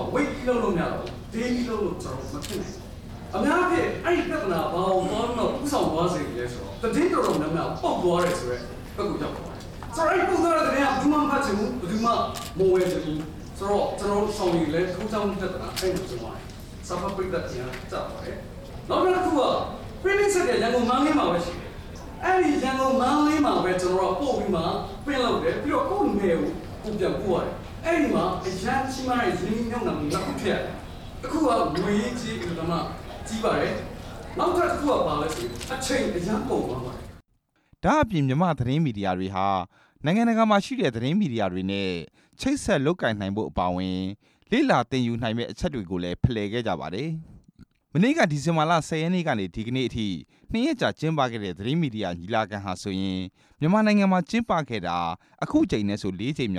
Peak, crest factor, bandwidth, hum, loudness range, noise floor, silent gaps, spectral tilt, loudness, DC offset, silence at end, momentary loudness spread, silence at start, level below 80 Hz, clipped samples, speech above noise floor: -6 dBFS; 18 dB; 17 kHz; none; 4 LU; -69 dBFS; none; -6 dB/octave; -25 LUFS; under 0.1%; 0 s; 12 LU; 0 s; -44 dBFS; under 0.1%; 44 dB